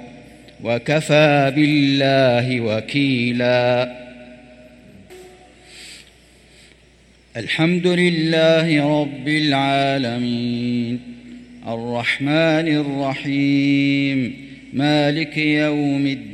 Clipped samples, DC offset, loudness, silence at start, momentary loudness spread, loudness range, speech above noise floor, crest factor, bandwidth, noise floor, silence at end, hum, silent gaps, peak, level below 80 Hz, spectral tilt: under 0.1%; under 0.1%; -18 LUFS; 0 s; 15 LU; 7 LU; 33 dB; 18 dB; 11.5 kHz; -51 dBFS; 0 s; none; none; -2 dBFS; -56 dBFS; -6.5 dB/octave